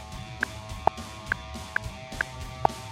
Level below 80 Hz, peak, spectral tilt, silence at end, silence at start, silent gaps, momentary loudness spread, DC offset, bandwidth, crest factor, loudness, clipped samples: -44 dBFS; -6 dBFS; -4 dB/octave; 0 s; 0 s; none; 7 LU; under 0.1%; 16 kHz; 26 dB; -32 LUFS; under 0.1%